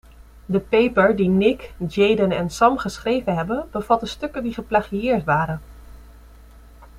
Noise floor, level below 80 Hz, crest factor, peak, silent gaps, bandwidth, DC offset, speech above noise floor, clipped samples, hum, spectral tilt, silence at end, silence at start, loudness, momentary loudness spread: -45 dBFS; -44 dBFS; 18 dB; -2 dBFS; none; 15 kHz; under 0.1%; 25 dB; under 0.1%; none; -6.5 dB/octave; 0 s; 0.2 s; -20 LUFS; 10 LU